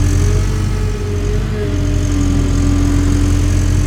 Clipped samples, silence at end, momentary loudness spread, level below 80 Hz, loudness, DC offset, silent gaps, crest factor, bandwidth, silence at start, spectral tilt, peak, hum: under 0.1%; 0 s; 4 LU; -18 dBFS; -16 LUFS; under 0.1%; none; 12 dB; 13 kHz; 0 s; -6.5 dB/octave; -2 dBFS; none